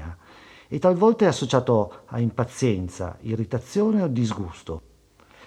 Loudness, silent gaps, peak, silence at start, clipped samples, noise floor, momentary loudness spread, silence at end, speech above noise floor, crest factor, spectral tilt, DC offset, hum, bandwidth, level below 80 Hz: -23 LUFS; none; -4 dBFS; 0 s; under 0.1%; -55 dBFS; 15 LU; 0.7 s; 32 dB; 20 dB; -7 dB/octave; under 0.1%; none; 11.5 kHz; -50 dBFS